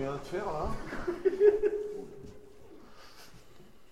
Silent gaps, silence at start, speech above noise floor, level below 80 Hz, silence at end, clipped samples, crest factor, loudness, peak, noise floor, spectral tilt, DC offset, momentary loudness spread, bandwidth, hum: none; 0 s; 24 dB; -48 dBFS; 0.3 s; under 0.1%; 22 dB; -31 LUFS; -12 dBFS; -57 dBFS; -6.5 dB/octave; 0.2%; 26 LU; 12.5 kHz; none